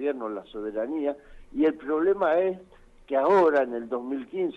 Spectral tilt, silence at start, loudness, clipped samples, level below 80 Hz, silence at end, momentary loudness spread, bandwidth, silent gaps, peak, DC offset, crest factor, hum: -7 dB/octave; 0 s; -26 LUFS; under 0.1%; -56 dBFS; 0 s; 14 LU; 7.4 kHz; none; -12 dBFS; under 0.1%; 14 dB; none